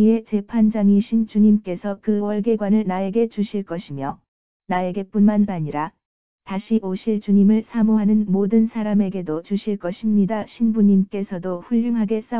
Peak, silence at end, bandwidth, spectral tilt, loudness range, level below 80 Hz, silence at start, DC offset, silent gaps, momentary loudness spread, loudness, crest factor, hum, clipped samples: -6 dBFS; 0 s; 4 kHz; -12.5 dB/octave; 4 LU; -58 dBFS; 0 s; 0.8%; 4.28-4.60 s, 6.05-6.39 s; 11 LU; -20 LUFS; 12 dB; none; under 0.1%